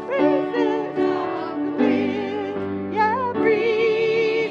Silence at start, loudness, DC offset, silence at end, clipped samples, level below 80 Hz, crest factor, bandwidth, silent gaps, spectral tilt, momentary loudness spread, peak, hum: 0 s; -21 LUFS; under 0.1%; 0 s; under 0.1%; -66 dBFS; 14 dB; 7.2 kHz; none; -6.5 dB/octave; 7 LU; -6 dBFS; none